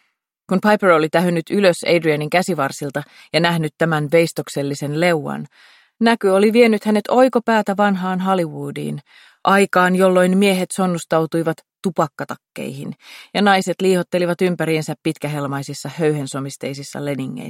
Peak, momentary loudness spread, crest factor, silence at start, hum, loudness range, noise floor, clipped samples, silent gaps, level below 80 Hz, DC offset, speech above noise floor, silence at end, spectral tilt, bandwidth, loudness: -2 dBFS; 14 LU; 16 dB; 0.5 s; none; 4 LU; -49 dBFS; under 0.1%; none; -66 dBFS; under 0.1%; 31 dB; 0 s; -5.5 dB/octave; 16.5 kHz; -18 LUFS